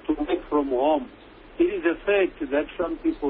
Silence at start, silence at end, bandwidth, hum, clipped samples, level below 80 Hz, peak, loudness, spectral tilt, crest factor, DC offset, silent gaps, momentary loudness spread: 0.05 s; 0 s; 4.3 kHz; none; under 0.1%; -48 dBFS; -8 dBFS; -25 LUFS; -9.5 dB/octave; 16 dB; under 0.1%; none; 5 LU